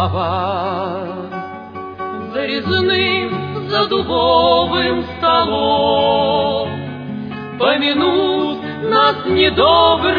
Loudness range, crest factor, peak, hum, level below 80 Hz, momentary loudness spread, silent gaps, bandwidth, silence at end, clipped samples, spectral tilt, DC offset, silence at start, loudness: 5 LU; 16 dB; 0 dBFS; none; -42 dBFS; 14 LU; none; 5.2 kHz; 0 s; under 0.1%; -7.5 dB/octave; under 0.1%; 0 s; -16 LUFS